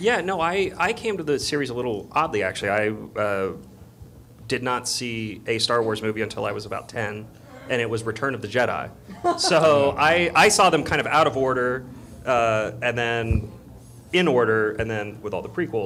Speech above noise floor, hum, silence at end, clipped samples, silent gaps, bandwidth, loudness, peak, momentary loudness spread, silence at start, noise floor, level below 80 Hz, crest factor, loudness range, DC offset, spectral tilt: 23 dB; none; 0 s; under 0.1%; none; 16 kHz; -22 LUFS; -8 dBFS; 13 LU; 0 s; -45 dBFS; -46 dBFS; 16 dB; 7 LU; under 0.1%; -4 dB/octave